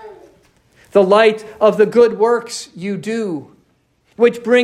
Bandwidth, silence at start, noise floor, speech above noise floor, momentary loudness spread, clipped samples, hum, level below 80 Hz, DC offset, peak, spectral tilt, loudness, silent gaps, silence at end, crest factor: 12 kHz; 0.05 s; -59 dBFS; 45 dB; 13 LU; under 0.1%; none; -62 dBFS; under 0.1%; 0 dBFS; -5 dB/octave; -15 LUFS; none; 0 s; 16 dB